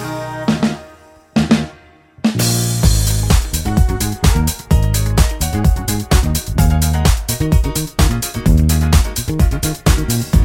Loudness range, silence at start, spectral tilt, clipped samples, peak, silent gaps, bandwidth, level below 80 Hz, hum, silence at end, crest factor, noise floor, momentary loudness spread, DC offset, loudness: 1 LU; 0 s; -5 dB/octave; under 0.1%; 0 dBFS; none; 17 kHz; -18 dBFS; none; 0 s; 14 dB; -44 dBFS; 5 LU; under 0.1%; -16 LUFS